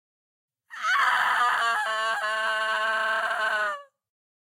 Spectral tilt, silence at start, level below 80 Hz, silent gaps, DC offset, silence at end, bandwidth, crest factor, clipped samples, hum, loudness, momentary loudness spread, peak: 1 dB/octave; 0.7 s; -84 dBFS; none; under 0.1%; 0.65 s; 16 kHz; 16 dB; under 0.1%; none; -24 LUFS; 8 LU; -10 dBFS